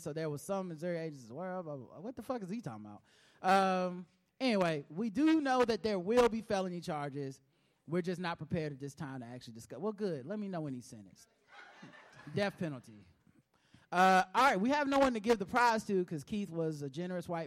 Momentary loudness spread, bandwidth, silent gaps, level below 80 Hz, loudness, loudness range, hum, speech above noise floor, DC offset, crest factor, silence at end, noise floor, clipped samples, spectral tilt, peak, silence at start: 18 LU; 16 kHz; none; -66 dBFS; -34 LUFS; 12 LU; none; 35 dB; under 0.1%; 20 dB; 0 s; -70 dBFS; under 0.1%; -5.5 dB/octave; -14 dBFS; 0 s